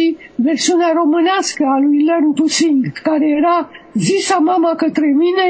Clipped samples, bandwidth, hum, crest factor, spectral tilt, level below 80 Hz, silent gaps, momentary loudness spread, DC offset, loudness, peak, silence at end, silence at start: under 0.1%; 8 kHz; none; 12 dB; -4 dB/octave; -62 dBFS; none; 5 LU; under 0.1%; -14 LUFS; -2 dBFS; 0 s; 0 s